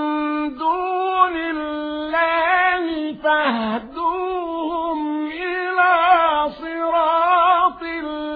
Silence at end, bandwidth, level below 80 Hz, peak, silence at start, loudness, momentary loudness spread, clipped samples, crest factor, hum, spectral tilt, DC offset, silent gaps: 0 s; 4.9 kHz; -52 dBFS; -4 dBFS; 0 s; -19 LUFS; 10 LU; under 0.1%; 16 dB; none; -7 dB/octave; under 0.1%; none